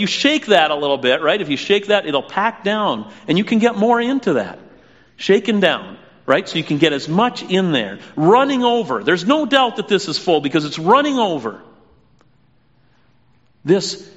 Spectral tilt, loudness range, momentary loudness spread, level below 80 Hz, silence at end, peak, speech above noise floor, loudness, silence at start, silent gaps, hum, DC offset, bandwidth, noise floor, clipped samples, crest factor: -3 dB/octave; 4 LU; 7 LU; -62 dBFS; 0.1 s; 0 dBFS; 41 dB; -17 LUFS; 0 s; none; none; 0.1%; 8 kHz; -57 dBFS; under 0.1%; 18 dB